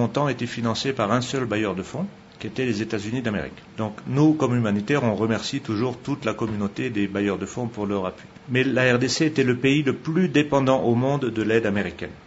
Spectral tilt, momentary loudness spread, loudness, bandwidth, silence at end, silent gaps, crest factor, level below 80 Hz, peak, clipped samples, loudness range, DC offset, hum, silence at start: -6 dB/octave; 11 LU; -23 LUFS; 8 kHz; 0.05 s; none; 18 dB; -56 dBFS; -4 dBFS; under 0.1%; 5 LU; under 0.1%; none; 0 s